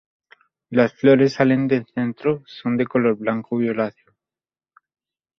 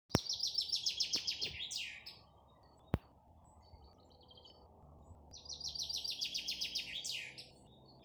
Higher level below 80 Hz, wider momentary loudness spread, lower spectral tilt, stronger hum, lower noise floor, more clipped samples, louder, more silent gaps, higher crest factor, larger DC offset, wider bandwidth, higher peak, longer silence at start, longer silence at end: about the same, -62 dBFS vs -62 dBFS; second, 10 LU vs 24 LU; first, -8 dB/octave vs -2 dB/octave; neither; first, under -90 dBFS vs -64 dBFS; neither; first, -20 LUFS vs -38 LUFS; neither; second, 20 dB vs 34 dB; neither; second, 6.4 kHz vs over 20 kHz; first, -2 dBFS vs -10 dBFS; first, 0.7 s vs 0.1 s; first, 1.5 s vs 0 s